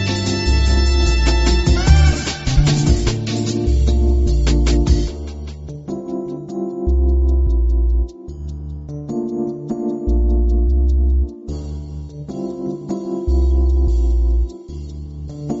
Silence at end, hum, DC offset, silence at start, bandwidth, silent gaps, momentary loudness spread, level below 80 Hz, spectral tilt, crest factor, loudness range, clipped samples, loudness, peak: 0 s; none; under 0.1%; 0 s; 8 kHz; none; 14 LU; -18 dBFS; -6.5 dB/octave; 16 dB; 5 LU; under 0.1%; -18 LUFS; 0 dBFS